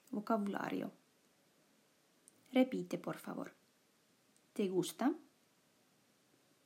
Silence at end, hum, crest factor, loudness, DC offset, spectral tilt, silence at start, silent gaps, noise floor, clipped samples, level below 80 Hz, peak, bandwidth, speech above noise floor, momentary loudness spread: 1.45 s; none; 22 dB; -39 LUFS; under 0.1%; -5.5 dB/octave; 0.1 s; none; -73 dBFS; under 0.1%; under -90 dBFS; -20 dBFS; 16 kHz; 36 dB; 14 LU